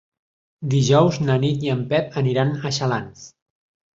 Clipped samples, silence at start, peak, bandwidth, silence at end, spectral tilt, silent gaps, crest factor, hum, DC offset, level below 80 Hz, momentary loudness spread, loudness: under 0.1%; 0.6 s; -2 dBFS; 7.8 kHz; 0.65 s; -6 dB/octave; none; 18 dB; none; under 0.1%; -54 dBFS; 9 LU; -20 LUFS